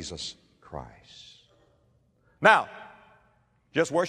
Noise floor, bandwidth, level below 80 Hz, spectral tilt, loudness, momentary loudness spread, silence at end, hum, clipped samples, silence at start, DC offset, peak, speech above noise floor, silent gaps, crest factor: -66 dBFS; 13 kHz; -60 dBFS; -4 dB/octave; -24 LUFS; 28 LU; 0 s; none; under 0.1%; 0 s; under 0.1%; -4 dBFS; 40 dB; none; 26 dB